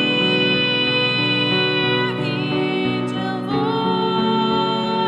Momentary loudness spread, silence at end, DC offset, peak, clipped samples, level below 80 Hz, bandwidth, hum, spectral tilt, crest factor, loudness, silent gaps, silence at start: 6 LU; 0 s; under 0.1%; -6 dBFS; under 0.1%; -56 dBFS; 11 kHz; none; -6.5 dB/octave; 14 dB; -18 LUFS; none; 0 s